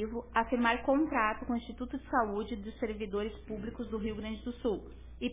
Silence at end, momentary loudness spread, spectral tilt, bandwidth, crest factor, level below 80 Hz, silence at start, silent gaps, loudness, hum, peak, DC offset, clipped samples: 0 s; 11 LU; -4 dB/octave; 3.8 kHz; 20 dB; -50 dBFS; 0 s; none; -34 LUFS; none; -14 dBFS; 0.1%; under 0.1%